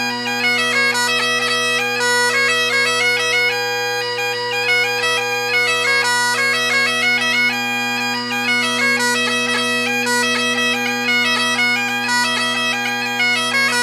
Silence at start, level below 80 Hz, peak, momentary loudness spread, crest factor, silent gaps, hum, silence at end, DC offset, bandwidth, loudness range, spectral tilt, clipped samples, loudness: 0 s; -70 dBFS; -6 dBFS; 4 LU; 12 dB; none; none; 0 s; under 0.1%; 16 kHz; 1 LU; -1 dB/octave; under 0.1%; -15 LUFS